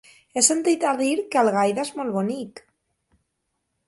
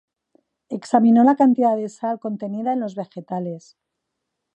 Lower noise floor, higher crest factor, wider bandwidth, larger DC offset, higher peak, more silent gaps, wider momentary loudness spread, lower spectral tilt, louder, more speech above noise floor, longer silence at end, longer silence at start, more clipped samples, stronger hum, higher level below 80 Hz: about the same, -77 dBFS vs -79 dBFS; about the same, 22 dB vs 18 dB; first, 11.5 kHz vs 8.6 kHz; neither; about the same, -2 dBFS vs -2 dBFS; neither; second, 12 LU vs 18 LU; second, -3 dB/octave vs -7.5 dB/octave; about the same, -22 LUFS vs -20 LUFS; second, 55 dB vs 60 dB; first, 1.3 s vs 1 s; second, 0.35 s vs 0.7 s; neither; neither; first, -70 dBFS vs -76 dBFS